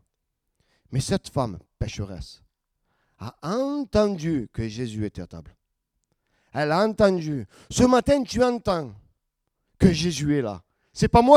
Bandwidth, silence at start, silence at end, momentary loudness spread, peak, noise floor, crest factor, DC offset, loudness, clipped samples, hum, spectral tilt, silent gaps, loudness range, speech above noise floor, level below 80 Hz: 14.5 kHz; 0.9 s; 0 s; 20 LU; 0 dBFS; -78 dBFS; 24 dB; under 0.1%; -24 LUFS; under 0.1%; none; -6 dB/octave; none; 7 LU; 56 dB; -44 dBFS